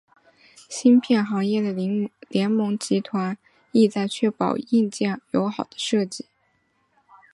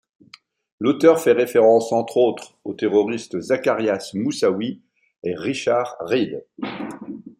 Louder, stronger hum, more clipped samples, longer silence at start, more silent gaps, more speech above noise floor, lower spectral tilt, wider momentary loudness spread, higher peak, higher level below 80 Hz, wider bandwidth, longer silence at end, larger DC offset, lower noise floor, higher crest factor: second, -23 LUFS vs -20 LUFS; neither; neither; about the same, 0.7 s vs 0.8 s; neither; first, 46 dB vs 31 dB; about the same, -5.5 dB/octave vs -5.5 dB/octave; second, 10 LU vs 16 LU; second, -6 dBFS vs -2 dBFS; about the same, -70 dBFS vs -68 dBFS; second, 11.5 kHz vs 16 kHz; first, 1.1 s vs 0.1 s; neither; first, -67 dBFS vs -50 dBFS; about the same, 18 dB vs 18 dB